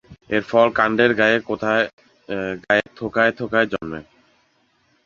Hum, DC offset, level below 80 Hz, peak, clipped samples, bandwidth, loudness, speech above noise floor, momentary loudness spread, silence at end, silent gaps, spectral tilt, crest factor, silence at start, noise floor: none; under 0.1%; -54 dBFS; -2 dBFS; under 0.1%; 7.2 kHz; -19 LUFS; 43 dB; 12 LU; 1.05 s; 1.93-1.98 s; -6 dB/octave; 20 dB; 0.1 s; -63 dBFS